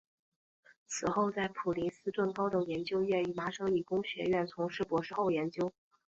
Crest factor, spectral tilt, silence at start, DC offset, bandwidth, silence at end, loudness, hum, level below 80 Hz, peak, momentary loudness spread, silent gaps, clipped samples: 16 dB; -5.5 dB/octave; 0.9 s; under 0.1%; 8 kHz; 0.45 s; -34 LUFS; none; -68 dBFS; -18 dBFS; 4 LU; none; under 0.1%